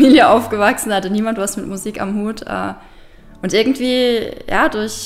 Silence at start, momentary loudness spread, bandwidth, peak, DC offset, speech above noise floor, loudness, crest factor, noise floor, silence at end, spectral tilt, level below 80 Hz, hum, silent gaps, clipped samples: 0 s; 12 LU; 16 kHz; 0 dBFS; under 0.1%; 24 dB; -16 LUFS; 16 dB; -40 dBFS; 0 s; -4 dB/octave; -42 dBFS; none; none; under 0.1%